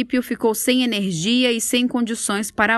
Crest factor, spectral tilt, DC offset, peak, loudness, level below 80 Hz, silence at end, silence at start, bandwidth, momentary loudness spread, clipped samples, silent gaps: 18 dB; -3 dB/octave; under 0.1%; -2 dBFS; -19 LUFS; -56 dBFS; 0 s; 0 s; 13 kHz; 4 LU; under 0.1%; none